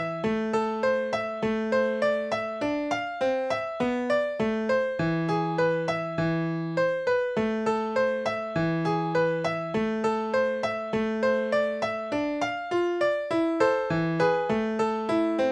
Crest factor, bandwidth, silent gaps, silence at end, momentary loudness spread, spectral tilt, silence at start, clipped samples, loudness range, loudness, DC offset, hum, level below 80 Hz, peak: 16 dB; 10 kHz; none; 0 s; 4 LU; -6.5 dB/octave; 0 s; under 0.1%; 1 LU; -27 LUFS; under 0.1%; none; -58 dBFS; -10 dBFS